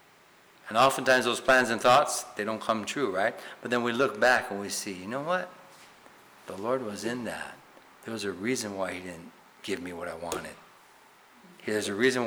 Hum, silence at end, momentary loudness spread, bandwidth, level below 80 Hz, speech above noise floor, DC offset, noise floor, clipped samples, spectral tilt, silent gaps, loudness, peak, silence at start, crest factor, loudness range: none; 0 s; 18 LU; over 20 kHz; -66 dBFS; 30 dB; under 0.1%; -58 dBFS; under 0.1%; -3 dB/octave; none; -28 LUFS; -14 dBFS; 0.65 s; 16 dB; 11 LU